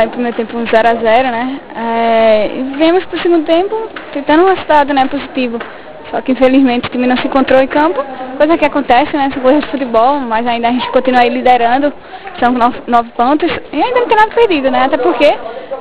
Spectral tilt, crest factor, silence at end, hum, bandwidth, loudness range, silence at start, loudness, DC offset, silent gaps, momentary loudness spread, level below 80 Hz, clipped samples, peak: -8.5 dB/octave; 12 dB; 0 s; none; 4 kHz; 1 LU; 0 s; -12 LUFS; 3%; none; 10 LU; -44 dBFS; 0.2%; 0 dBFS